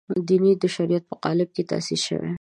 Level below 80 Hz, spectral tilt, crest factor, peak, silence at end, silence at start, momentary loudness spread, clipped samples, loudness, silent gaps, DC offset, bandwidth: -64 dBFS; -5.5 dB/octave; 14 dB; -8 dBFS; 0.05 s; 0.1 s; 6 LU; under 0.1%; -23 LUFS; none; under 0.1%; 11 kHz